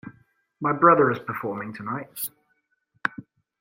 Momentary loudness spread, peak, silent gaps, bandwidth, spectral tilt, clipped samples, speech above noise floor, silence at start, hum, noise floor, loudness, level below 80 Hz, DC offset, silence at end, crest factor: 15 LU; -2 dBFS; none; 16 kHz; -6 dB/octave; under 0.1%; 49 dB; 0.05 s; none; -72 dBFS; -24 LUFS; -68 dBFS; under 0.1%; 0.4 s; 22 dB